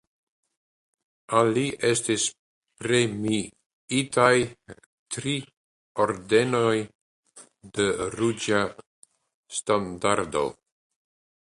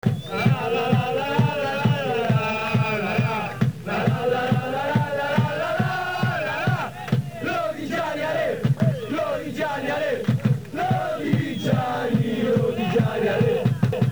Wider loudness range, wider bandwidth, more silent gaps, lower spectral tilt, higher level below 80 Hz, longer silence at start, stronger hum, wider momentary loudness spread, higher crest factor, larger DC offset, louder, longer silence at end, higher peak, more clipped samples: about the same, 3 LU vs 2 LU; second, 11.5 kHz vs over 20 kHz; first, 2.39-2.62 s, 3.66-3.88 s, 4.86-5.06 s, 5.57-5.95 s, 6.95-7.23 s, 8.86-9.03 s, 9.34-9.43 s vs none; second, -4 dB/octave vs -7 dB/octave; second, -60 dBFS vs -54 dBFS; first, 1.3 s vs 0.05 s; neither; first, 12 LU vs 4 LU; first, 24 dB vs 16 dB; second, under 0.1% vs 0.4%; about the same, -25 LUFS vs -23 LUFS; first, 1 s vs 0 s; about the same, -4 dBFS vs -6 dBFS; neither